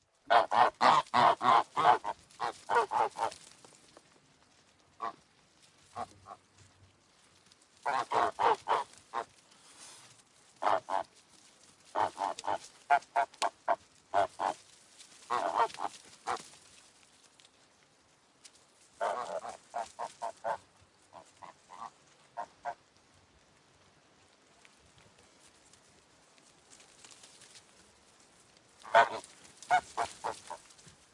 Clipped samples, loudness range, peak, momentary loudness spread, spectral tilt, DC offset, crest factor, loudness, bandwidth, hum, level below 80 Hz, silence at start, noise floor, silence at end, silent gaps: under 0.1%; 18 LU; -10 dBFS; 26 LU; -2.5 dB/octave; under 0.1%; 26 dB; -32 LUFS; 11.5 kHz; none; -78 dBFS; 0.3 s; -66 dBFS; 0.55 s; none